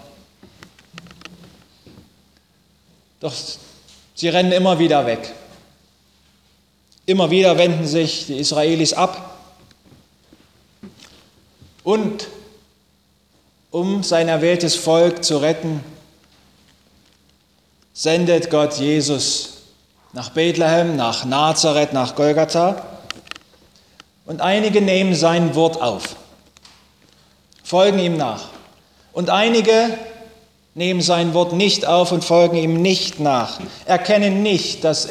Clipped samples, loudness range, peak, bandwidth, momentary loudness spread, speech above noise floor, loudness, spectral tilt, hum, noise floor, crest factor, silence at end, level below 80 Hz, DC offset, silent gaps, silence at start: under 0.1%; 10 LU; 0 dBFS; 15 kHz; 17 LU; 42 dB; -17 LUFS; -4.5 dB/octave; none; -59 dBFS; 18 dB; 0 s; -58 dBFS; under 0.1%; none; 0.95 s